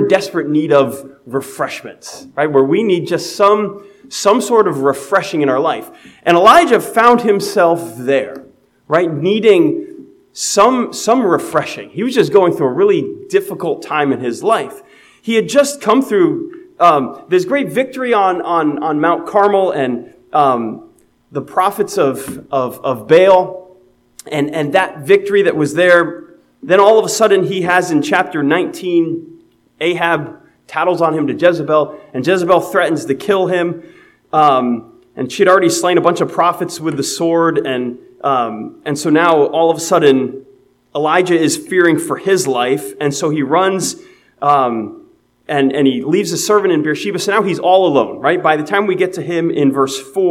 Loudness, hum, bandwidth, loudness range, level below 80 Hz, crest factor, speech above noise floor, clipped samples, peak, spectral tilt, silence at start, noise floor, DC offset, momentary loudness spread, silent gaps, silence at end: -14 LUFS; none; 16.5 kHz; 4 LU; -60 dBFS; 14 dB; 35 dB; 0.1%; 0 dBFS; -4.5 dB/octave; 0 s; -48 dBFS; under 0.1%; 11 LU; none; 0 s